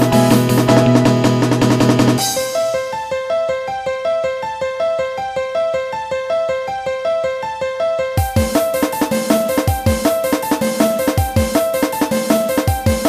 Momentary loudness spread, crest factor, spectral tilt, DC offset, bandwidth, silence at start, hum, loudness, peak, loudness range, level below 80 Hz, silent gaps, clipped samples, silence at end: 9 LU; 16 dB; -5.5 dB/octave; under 0.1%; 15.5 kHz; 0 s; none; -16 LUFS; 0 dBFS; 5 LU; -34 dBFS; none; under 0.1%; 0 s